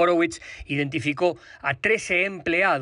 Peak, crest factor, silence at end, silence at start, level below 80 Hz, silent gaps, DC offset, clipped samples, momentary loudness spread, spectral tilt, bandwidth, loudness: -8 dBFS; 14 dB; 0 s; 0 s; -52 dBFS; none; under 0.1%; under 0.1%; 8 LU; -5 dB/octave; 11 kHz; -24 LUFS